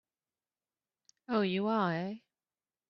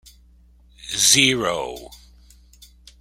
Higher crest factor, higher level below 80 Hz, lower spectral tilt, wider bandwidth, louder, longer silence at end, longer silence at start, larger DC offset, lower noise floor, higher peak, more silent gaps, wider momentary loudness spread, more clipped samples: second, 18 dB vs 24 dB; second, -78 dBFS vs -50 dBFS; first, -5 dB/octave vs -1 dB/octave; second, 6.8 kHz vs 16.5 kHz; second, -33 LUFS vs -17 LUFS; second, 0.7 s vs 1.05 s; first, 1.3 s vs 0.85 s; neither; first, under -90 dBFS vs -52 dBFS; second, -18 dBFS vs 0 dBFS; neither; second, 11 LU vs 24 LU; neither